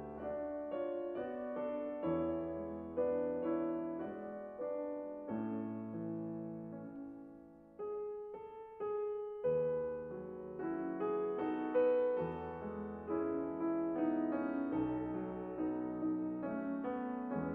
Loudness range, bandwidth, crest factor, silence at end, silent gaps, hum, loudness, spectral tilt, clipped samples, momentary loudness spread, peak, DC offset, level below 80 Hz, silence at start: 7 LU; 3.6 kHz; 16 dB; 0 s; none; none; -40 LUFS; -10.5 dB/octave; under 0.1%; 11 LU; -22 dBFS; under 0.1%; -68 dBFS; 0 s